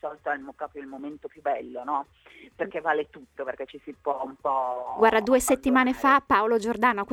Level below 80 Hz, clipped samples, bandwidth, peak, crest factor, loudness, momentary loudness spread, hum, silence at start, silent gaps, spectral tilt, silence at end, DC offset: -56 dBFS; under 0.1%; 17.5 kHz; -8 dBFS; 18 dB; -25 LUFS; 17 LU; none; 0.05 s; none; -3.5 dB/octave; 0 s; under 0.1%